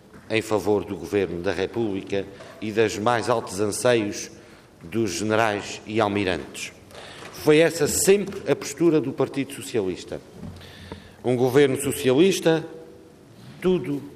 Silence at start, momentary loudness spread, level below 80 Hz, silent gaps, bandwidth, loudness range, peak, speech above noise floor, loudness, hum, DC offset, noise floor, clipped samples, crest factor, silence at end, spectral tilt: 0.15 s; 20 LU; -58 dBFS; none; 15.5 kHz; 3 LU; -6 dBFS; 25 dB; -23 LUFS; none; under 0.1%; -47 dBFS; under 0.1%; 18 dB; 0 s; -4.5 dB/octave